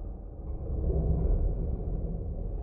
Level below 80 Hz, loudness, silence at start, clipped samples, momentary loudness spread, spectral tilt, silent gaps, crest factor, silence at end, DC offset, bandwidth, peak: -32 dBFS; -33 LUFS; 0 s; under 0.1%; 12 LU; -14.5 dB/octave; none; 14 dB; 0 s; under 0.1%; 1.6 kHz; -16 dBFS